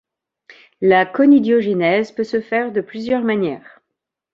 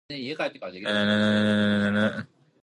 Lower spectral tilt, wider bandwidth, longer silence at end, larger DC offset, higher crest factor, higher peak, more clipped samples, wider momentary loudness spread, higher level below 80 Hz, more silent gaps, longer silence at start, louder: first, -7.5 dB/octave vs -6 dB/octave; second, 7.2 kHz vs 9.8 kHz; first, 0.75 s vs 0.35 s; neither; about the same, 16 dB vs 14 dB; first, -2 dBFS vs -12 dBFS; neither; about the same, 10 LU vs 11 LU; about the same, -62 dBFS vs -60 dBFS; neither; first, 0.8 s vs 0.1 s; first, -17 LUFS vs -25 LUFS